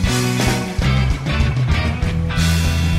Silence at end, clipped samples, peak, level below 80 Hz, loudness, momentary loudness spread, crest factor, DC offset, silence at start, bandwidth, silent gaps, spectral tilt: 0 s; under 0.1%; -6 dBFS; -24 dBFS; -18 LUFS; 3 LU; 10 dB; under 0.1%; 0 s; 16 kHz; none; -5 dB/octave